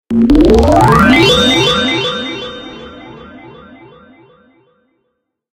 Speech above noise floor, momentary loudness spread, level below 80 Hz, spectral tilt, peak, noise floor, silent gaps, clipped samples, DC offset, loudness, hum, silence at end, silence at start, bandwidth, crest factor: 61 dB; 21 LU; -26 dBFS; -5 dB/octave; 0 dBFS; -69 dBFS; none; under 0.1%; under 0.1%; -9 LUFS; none; 2.15 s; 0.1 s; 17 kHz; 12 dB